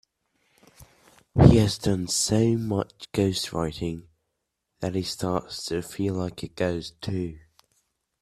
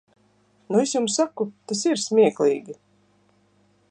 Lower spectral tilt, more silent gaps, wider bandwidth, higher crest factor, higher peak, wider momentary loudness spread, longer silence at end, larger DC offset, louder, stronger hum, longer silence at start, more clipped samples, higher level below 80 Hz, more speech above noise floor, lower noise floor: first, -5.5 dB/octave vs -4 dB/octave; neither; first, 14 kHz vs 10 kHz; first, 26 dB vs 18 dB; first, 0 dBFS vs -6 dBFS; first, 15 LU vs 12 LU; second, 0.85 s vs 1.2 s; neither; second, -25 LUFS vs -22 LUFS; second, none vs 50 Hz at -45 dBFS; about the same, 0.8 s vs 0.7 s; neither; first, -44 dBFS vs -76 dBFS; first, 56 dB vs 40 dB; first, -80 dBFS vs -62 dBFS